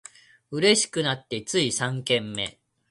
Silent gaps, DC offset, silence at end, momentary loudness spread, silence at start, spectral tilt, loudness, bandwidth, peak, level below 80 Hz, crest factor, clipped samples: none; under 0.1%; 0.4 s; 11 LU; 0.5 s; -3 dB/octave; -24 LUFS; 11.5 kHz; -6 dBFS; -64 dBFS; 20 dB; under 0.1%